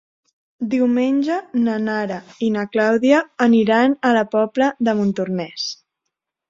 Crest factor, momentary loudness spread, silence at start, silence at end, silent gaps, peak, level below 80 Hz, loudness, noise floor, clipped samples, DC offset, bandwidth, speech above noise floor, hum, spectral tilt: 16 dB; 10 LU; 0.6 s; 0.75 s; none; -2 dBFS; -64 dBFS; -18 LUFS; -80 dBFS; under 0.1%; under 0.1%; 7.6 kHz; 62 dB; none; -6 dB/octave